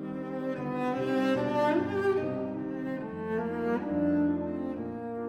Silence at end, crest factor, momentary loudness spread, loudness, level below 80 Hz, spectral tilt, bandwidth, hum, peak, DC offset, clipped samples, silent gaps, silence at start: 0 s; 14 dB; 8 LU; -31 LUFS; -62 dBFS; -8 dB/octave; 10.5 kHz; none; -16 dBFS; under 0.1%; under 0.1%; none; 0 s